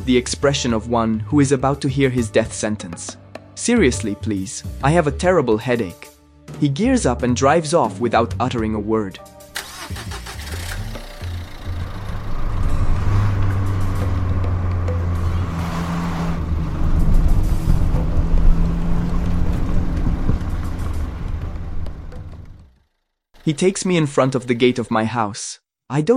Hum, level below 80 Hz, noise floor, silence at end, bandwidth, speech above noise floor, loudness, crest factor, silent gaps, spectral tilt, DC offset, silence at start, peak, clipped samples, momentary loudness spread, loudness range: none; -24 dBFS; -70 dBFS; 0 s; 13.5 kHz; 52 dB; -21 LUFS; 16 dB; none; -6 dB/octave; under 0.1%; 0 s; -2 dBFS; under 0.1%; 13 LU; 8 LU